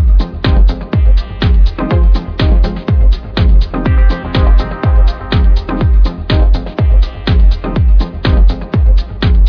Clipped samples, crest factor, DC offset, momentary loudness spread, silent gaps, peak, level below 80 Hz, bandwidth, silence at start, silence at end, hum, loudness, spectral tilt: under 0.1%; 8 dB; under 0.1%; 2 LU; none; 0 dBFS; -10 dBFS; 5.4 kHz; 0 s; 0 s; none; -13 LUFS; -8.5 dB/octave